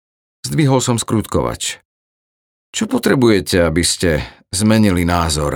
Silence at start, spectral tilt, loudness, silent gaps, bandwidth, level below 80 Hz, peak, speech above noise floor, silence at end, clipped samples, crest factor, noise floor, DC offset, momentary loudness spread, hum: 0.45 s; -4.5 dB/octave; -16 LUFS; 1.85-2.73 s; over 20 kHz; -36 dBFS; 0 dBFS; over 75 dB; 0 s; under 0.1%; 16 dB; under -90 dBFS; under 0.1%; 10 LU; none